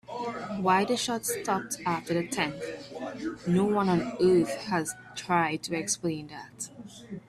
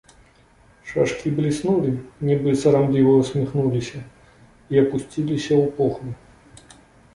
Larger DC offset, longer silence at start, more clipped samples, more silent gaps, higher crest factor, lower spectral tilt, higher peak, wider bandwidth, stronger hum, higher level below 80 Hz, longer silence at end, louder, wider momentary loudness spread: neither; second, 0.1 s vs 0.85 s; neither; neither; about the same, 18 dB vs 16 dB; second, -4.5 dB/octave vs -7.5 dB/octave; second, -10 dBFS vs -4 dBFS; first, 15 kHz vs 11.5 kHz; neither; second, -64 dBFS vs -52 dBFS; second, 0.1 s vs 1 s; second, -29 LUFS vs -21 LUFS; about the same, 14 LU vs 15 LU